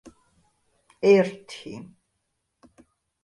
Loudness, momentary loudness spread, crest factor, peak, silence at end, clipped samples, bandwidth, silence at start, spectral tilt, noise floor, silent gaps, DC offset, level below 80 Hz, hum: -21 LUFS; 22 LU; 22 dB; -6 dBFS; 1.45 s; under 0.1%; 11.5 kHz; 1.05 s; -6.5 dB/octave; -77 dBFS; none; under 0.1%; -70 dBFS; none